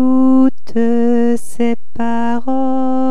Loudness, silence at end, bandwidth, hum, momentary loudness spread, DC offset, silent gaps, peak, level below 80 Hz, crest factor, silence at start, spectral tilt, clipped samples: -15 LUFS; 0 s; 12 kHz; none; 8 LU; 20%; none; -2 dBFS; -54 dBFS; 10 dB; 0 s; -6.5 dB/octave; under 0.1%